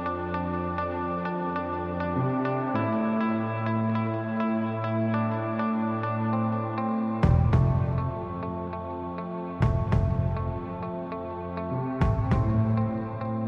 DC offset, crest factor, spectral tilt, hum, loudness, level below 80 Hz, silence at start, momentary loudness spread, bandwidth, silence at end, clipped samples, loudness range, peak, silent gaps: under 0.1%; 14 dB; -10 dB/octave; none; -28 LUFS; -40 dBFS; 0 s; 9 LU; 5.8 kHz; 0 s; under 0.1%; 3 LU; -12 dBFS; none